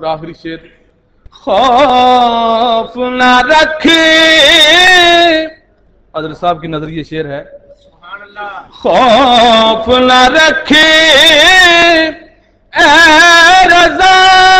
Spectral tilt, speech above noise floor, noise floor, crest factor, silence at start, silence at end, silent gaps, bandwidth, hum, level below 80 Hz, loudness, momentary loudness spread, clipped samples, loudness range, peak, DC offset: -2 dB/octave; 41 dB; -48 dBFS; 8 dB; 0 s; 0 s; none; 16.5 kHz; none; -36 dBFS; -5 LUFS; 19 LU; 1%; 10 LU; 0 dBFS; under 0.1%